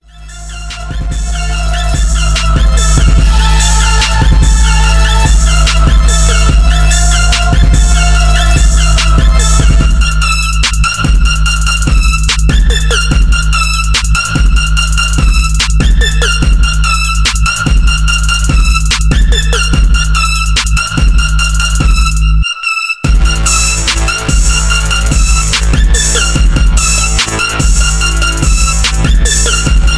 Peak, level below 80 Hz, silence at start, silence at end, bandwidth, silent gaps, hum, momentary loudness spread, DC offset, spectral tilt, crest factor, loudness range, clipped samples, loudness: 0 dBFS; -8 dBFS; 0.15 s; 0 s; 11 kHz; none; none; 3 LU; under 0.1%; -3 dB/octave; 8 dB; 2 LU; under 0.1%; -10 LUFS